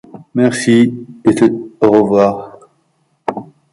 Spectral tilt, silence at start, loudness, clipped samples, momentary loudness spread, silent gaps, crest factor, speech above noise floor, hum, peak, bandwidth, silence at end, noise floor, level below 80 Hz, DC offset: -6 dB/octave; 0.15 s; -13 LUFS; under 0.1%; 14 LU; none; 14 dB; 50 dB; none; 0 dBFS; 11.5 kHz; 0.3 s; -60 dBFS; -54 dBFS; under 0.1%